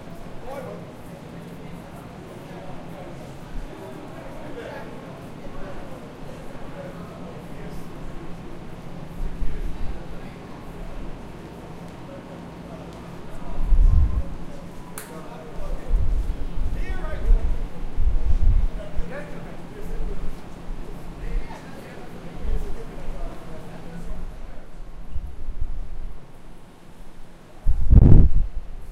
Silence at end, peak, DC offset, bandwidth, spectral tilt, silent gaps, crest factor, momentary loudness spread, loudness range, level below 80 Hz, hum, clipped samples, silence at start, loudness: 0 s; 0 dBFS; under 0.1%; 9.8 kHz; -8 dB/octave; none; 22 dB; 15 LU; 11 LU; -26 dBFS; none; under 0.1%; 0 s; -30 LUFS